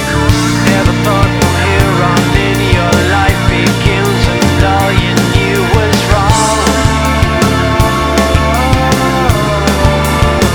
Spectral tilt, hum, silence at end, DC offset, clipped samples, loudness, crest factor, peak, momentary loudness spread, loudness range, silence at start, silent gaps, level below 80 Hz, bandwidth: -5 dB/octave; none; 0 s; under 0.1%; 0.6%; -10 LUFS; 10 dB; 0 dBFS; 1 LU; 0 LU; 0 s; none; -18 dBFS; over 20 kHz